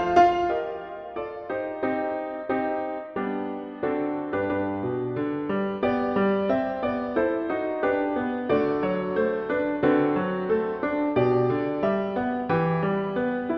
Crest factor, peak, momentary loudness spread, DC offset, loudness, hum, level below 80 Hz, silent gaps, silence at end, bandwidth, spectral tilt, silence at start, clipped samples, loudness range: 20 dB; -6 dBFS; 8 LU; under 0.1%; -26 LUFS; none; -56 dBFS; none; 0 s; 6.4 kHz; -8.5 dB/octave; 0 s; under 0.1%; 5 LU